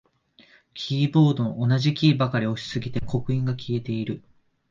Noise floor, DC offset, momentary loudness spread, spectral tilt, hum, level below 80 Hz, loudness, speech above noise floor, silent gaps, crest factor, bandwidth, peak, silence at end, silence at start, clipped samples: -57 dBFS; under 0.1%; 11 LU; -7.5 dB/octave; none; -52 dBFS; -24 LUFS; 34 dB; none; 18 dB; 7.4 kHz; -6 dBFS; 0.5 s; 0.75 s; under 0.1%